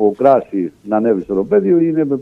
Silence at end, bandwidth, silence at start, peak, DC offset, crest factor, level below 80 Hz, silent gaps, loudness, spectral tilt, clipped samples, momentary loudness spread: 0 s; 4.3 kHz; 0 s; 0 dBFS; under 0.1%; 14 dB; -54 dBFS; none; -15 LUFS; -10 dB/octave; under 0.1%; 7 LU